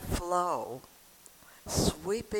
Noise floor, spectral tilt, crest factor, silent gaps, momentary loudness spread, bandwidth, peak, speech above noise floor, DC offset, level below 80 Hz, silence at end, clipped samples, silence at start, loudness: -56 dBFS; -4.5 dB/octave; 18 dB; none; 21 LU; 19 kHz; -14 dBFS; 25 dB; under 0.1%; -46 dBFS; 0 s; under 0.1%; 0 s; -32 LUFS